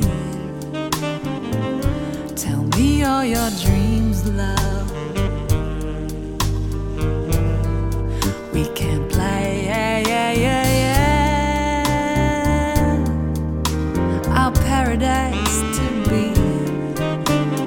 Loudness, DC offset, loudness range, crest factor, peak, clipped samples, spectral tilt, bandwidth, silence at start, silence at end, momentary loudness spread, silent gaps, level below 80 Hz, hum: -20 LUFS; under 0.1%; 5 LU; 16 dB; -2 dBFS; under 0.1%; -5.5 dB/octave; 20 kHz; 0 s; 0 s; 7 LU; none; -26 dBFS; none